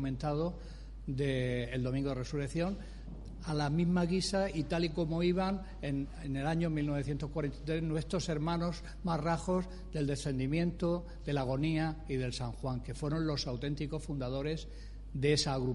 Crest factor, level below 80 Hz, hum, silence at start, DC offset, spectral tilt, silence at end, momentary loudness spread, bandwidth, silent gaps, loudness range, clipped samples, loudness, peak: 18 dB; -46 dBFS; none; 0 s; under 0.1%; -6 dB/octave; 0 s; 8 LU; 11.5 kHz; none; 3 LU; under 0.1%; -35 LUFS; -16 dBFS